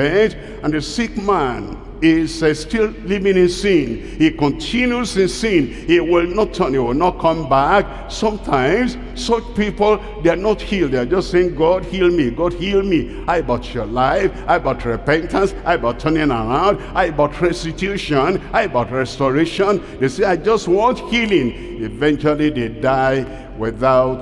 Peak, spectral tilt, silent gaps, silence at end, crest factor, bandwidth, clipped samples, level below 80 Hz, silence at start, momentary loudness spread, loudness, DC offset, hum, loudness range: -4 dBFS; -6 dB/octave; none; 0 s; 14 dB; 11.5 kHz; under 0.1%; -32 dBFS; 0 s; 6 LU; -17 LUFS; under 0.1%; none; 2 LU